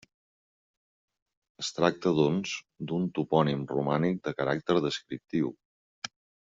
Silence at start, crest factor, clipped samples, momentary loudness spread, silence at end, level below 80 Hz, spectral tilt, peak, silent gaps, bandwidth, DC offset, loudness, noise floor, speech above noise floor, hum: 1.6 s; 24 dB; under 0.1%; 11 LU; 0.4 s; -68 dBFS; -5 dB/octave; -8 dBFS; 5.65-6.02 s; 7.6 kHz; under 0.1%; -29 LUFS; under -90 dBFS; over 62 dB; none